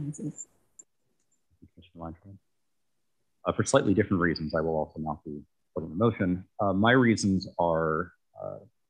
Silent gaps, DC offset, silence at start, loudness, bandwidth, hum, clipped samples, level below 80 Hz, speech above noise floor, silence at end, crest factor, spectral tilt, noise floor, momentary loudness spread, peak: none; under 0.1%; 0 s; -27 LUFS; 10.5 kHz; none; under 0.1%; -56 dBFS; 56 dB; 0.3 s; 22 dB; -5.5 dB/octave; -84 dBFS; 21 LU; -8 dBFS